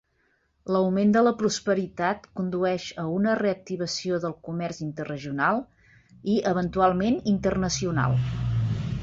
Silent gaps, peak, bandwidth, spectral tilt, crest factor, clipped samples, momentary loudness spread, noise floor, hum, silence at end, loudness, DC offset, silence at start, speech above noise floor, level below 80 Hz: none; -8 dBFS; 7.8 kHz; -6 dB/octave; 18 dB; under 0.1%; 10 LU; -69 dBFS; none; 0 s; -26 LUFS; under 0.1%; 0.65 s; 44 dB; -48 dBFS